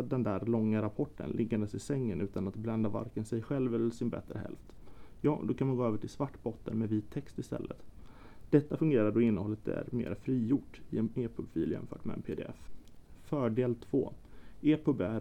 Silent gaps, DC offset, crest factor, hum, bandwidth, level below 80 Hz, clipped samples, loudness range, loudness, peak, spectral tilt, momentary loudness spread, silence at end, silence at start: none; 0.2%; 20 dB; none; 11 kHz; -56 dBFS; under 0.1%; 4 LU; -34 LUFS; -12 dBFS; -8.5 dB/octave; 11 LU; 0 s; 0 s